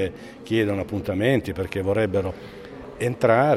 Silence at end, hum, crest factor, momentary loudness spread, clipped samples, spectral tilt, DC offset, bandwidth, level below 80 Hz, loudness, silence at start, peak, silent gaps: 0 s; none; 18 dB; 18 LU; under 0.1%; -7 dB/octave; under 0.1%; 14.5 kHz; -50 dBFS; -24 LUFS; 0 s; -4 dBFS; none